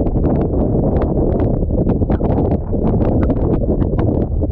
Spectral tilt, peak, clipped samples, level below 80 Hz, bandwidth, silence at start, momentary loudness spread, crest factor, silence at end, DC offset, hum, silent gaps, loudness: -13 dB/octave; -2 dBFS; under 0.1%; -20 dBFS; 4 kHz; 0 s; 2 LU; 12 dB; 0 s; under 0.1%; none; none; -17 LUFS